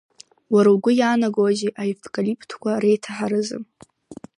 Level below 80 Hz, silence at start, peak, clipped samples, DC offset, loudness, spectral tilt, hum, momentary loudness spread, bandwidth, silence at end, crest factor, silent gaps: -70 dBFS; 0.5 s; -4 dBFS; under 0.1%; under 0.1%; -21 LUFS; -6 dB/octave; none; 11 LU; 11 kHz; 0.25 s; 16 dB; none